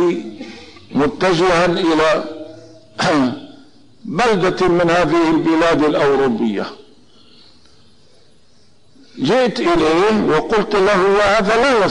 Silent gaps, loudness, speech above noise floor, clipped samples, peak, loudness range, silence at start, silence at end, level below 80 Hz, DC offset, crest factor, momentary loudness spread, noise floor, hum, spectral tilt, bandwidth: none; -15 LUFS; 40 dB; under 0.1%; -8 dBFS; 7 LU; 0 s; 0 s; -44 dBFS; under 0.1%; 8 dB; 16 LU; -54 dBFS; none; -5.5 dB/octave; 10.5 kHz